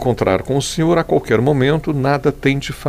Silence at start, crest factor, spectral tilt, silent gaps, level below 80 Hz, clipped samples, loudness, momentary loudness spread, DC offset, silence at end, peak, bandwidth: 0 s; 14 dB; -6 dB/octave; none; -38 dBFS; under 0.1%; -16 LUFS; 3 LU; 0.1%; 0 s; -2 dBFS; 16 kHz